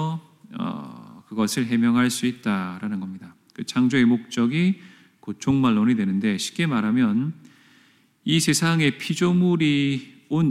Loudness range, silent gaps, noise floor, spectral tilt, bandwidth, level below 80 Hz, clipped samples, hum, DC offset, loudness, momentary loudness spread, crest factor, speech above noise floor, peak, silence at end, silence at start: 3 LU; none; -58 dBFS; -5 dB/octave; 15 kHz; -64 dBFS; under 0.1%; none; under 0.1%; -22 LUFS; 16 LU; 14 dB; 37 dB; -8 dBFS; 0 s; 0 s